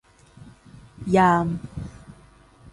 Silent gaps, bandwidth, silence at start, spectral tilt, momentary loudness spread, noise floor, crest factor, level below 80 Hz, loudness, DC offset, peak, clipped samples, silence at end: none; 11.5 kHz; 0.4 s; -7.5 dB/octave; 20 LU; -52 dBFS; 20 dB; -48 dBFS; -21 LUFS; under 0.1%; -6 dBFS; under 0.1%; 0.6 s